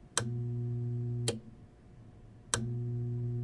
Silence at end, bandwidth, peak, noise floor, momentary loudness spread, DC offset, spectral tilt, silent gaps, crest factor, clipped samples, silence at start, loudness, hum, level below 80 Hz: 0 s; 11.5 kHz; -12 dBFS; -55 dBFS; 22 LU; under 0.1%; -4.5 dB/octave; none; 24 dB; under 0.1%; 0 s; -36 LUFS; none; -58 dBFS